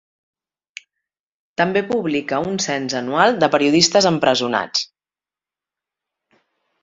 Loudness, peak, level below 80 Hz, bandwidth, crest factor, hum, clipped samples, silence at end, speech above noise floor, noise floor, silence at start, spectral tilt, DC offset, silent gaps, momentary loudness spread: -17 LUFS; 0 dBFS; -60 dBFS; 8 kHz; 20 dB; none; under 0.1%; 1.95 s; over 73 dB; under -90 dBFS; 1.6 s; -3.5 dB/octave; under 0.1%; none; 9 LU